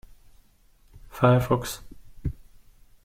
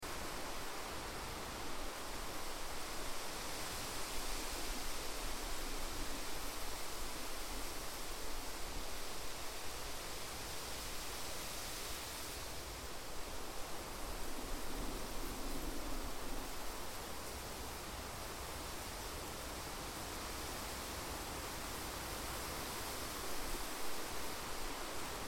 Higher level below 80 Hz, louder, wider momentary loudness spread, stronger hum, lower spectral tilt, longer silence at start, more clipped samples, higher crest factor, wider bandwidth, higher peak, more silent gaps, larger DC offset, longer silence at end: first, -44 dBFS vs -50 dBFS; first, -25 LUFS vs -44 LUFS; first, 22 LU vs 3 LU; neither; first, -6.5 dB/octave vs -2.5 dB/octave; first, 0.95 s vs 0 s; neither; first, 22 dB vs 14 dB; about the same, 16 kHz vs 17 kHz; first, -6 dBFS vs -28 dBFS; neither; neither; first, 0.75 s vs 0 s